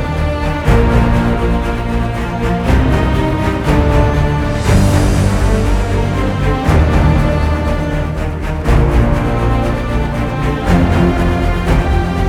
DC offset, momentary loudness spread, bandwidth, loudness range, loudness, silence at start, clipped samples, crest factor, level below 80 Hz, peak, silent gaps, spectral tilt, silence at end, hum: under 0.1%; 6 LU; 14.5 kHz; 2 LU; -14 LUFS; 0 s; under 0.1%; 12 dB; -16 dBFS; 0 dBFS; none; -7 dB/octave; 0 s; none